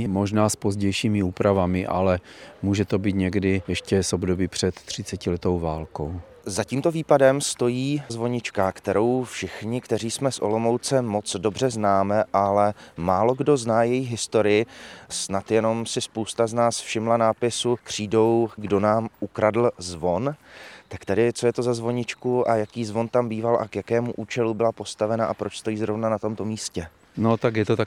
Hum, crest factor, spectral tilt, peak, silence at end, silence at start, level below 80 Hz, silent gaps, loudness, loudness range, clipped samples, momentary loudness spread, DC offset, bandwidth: none; 20 dB; -5.5 dB/octave; -4 dBFS; 0 s; 0 s; -56 dBFS; none; -24 LUFS; 3 LU; under 0.1%; 9 LU; under 0.1%; 16 kHz